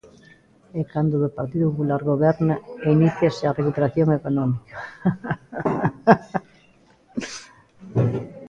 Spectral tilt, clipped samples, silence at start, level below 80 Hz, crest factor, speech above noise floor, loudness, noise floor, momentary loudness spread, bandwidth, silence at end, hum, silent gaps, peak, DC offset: -8 dB/octave; under 0.1%; 0.75 s; -54 dBFS; 22 dB; 35 dB; -22 LUFS; -56 dBFS; 13 LU; 8 kHz; 0 s; none; none; 0 dBFS; under 0.1%